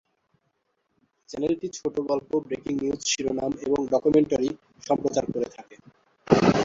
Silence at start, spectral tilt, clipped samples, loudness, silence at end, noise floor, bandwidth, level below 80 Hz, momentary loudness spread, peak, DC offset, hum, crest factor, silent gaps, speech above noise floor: 1.3 s; -5 dB/octave; under 0.1%; -26 LUFS; 0 s; -74 dBFS; 7.8 kHz; -56 dBFS; 9 LU; -2 dBFS; under 0.1%; none; 24 dB; none; 48 dB